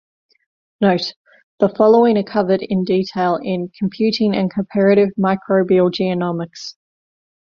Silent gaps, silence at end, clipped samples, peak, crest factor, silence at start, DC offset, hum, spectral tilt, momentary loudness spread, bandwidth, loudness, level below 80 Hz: 1.16-1.25 s, 1.43-1.58 s; 0.7 s; under 0.1%; -2 dBFS; 16 dB; 0.8 s; under 0.1%; none; -7.5 dB/octave; 11 LU; 7.2 kHz; -17 LUFS; -58 dBFS